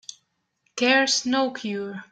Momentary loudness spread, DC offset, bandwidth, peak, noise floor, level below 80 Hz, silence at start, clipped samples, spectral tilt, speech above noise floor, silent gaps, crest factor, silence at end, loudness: 17 LU; under 0.1%; 9.4 kHz; -4 dBFS; -72 dBFS; -72 dBFS; 0.75 s; under 0.1%; -2 dB/octave; 49 dB; none; 20 dB; 0.05 s; -22 LUFS